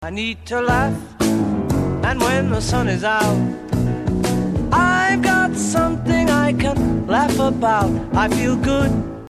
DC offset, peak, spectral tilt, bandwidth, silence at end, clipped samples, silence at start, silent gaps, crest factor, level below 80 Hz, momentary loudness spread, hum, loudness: under 0.1%; -4 dBFS; -5.5 dB/octave; 14 kHz; 0 s; under 0.1%; 0 s; none; 14 dB; -32 dBFS; 5 LU; none; -18 LUFS